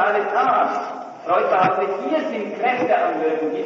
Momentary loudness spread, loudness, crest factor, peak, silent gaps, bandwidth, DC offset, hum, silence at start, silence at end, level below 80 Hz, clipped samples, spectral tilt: 8 LU; -20 LUFS; 14 dB; -6 dBFS; none; 7.2 kHz; under 0.1%; none; 0 s; 0 s; -76 dBFS; under 0.1%; -6 dB/octave